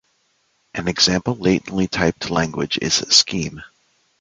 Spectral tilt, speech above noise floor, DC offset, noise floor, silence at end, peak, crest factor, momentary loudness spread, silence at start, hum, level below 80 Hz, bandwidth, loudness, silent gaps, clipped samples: -3 dB/octave; 45 dB; under 0.1%; -65 dBFS; 0.55 s; 0 dBFS; 22 dB; 12 LU; 0.75 s; none; -46 dBFS; 9.6 kHz; -18 LUFS; none; under 0.1%